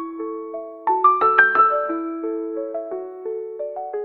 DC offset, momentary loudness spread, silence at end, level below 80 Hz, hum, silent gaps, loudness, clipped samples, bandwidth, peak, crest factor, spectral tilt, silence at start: under 0.1%; 16 LU; 0 s; -74 dBFS; none; none; -20 LUFS; under 0.1%; 4.4 kHz; 0 dBFS; 20 dB; -6.5 dB/octave; 0 s